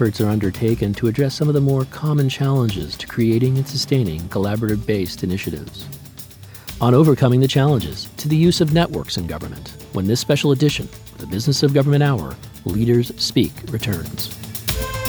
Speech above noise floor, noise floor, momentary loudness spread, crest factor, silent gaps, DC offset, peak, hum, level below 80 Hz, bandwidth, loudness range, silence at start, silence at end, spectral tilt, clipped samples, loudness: 20 dB; -38 dBFS; 15 LU; 16 dB; none; under 0.1%; -2 dBFS; none; -40 dBFS; over 20 kHz; 4 LU; 0 s; 0 s; -6 dB/octave; under 0.1%; -19 LUFS